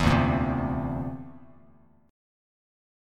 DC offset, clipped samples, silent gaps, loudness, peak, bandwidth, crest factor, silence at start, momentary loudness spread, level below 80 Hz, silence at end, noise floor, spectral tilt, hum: under 0.1%; under 0.1%; none; -27 LUFS; -6 dBFS; 14 kHz; 22 dB; 0 s; 18 LU; -40 dBFS; 1 s; -58 dBFS; -7 dB/octave; none